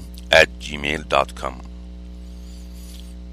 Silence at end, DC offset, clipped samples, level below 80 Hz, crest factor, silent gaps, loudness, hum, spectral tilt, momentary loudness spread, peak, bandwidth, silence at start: 0 s; under 0.1%; under 0.1%; -36 dBFS; 24 dB; none; -19 LUFS; 60 Hz at -35 dBFS; -3.5 dB/octave; 24 LU; 0 dBFS; 15.5 kHz; 0 s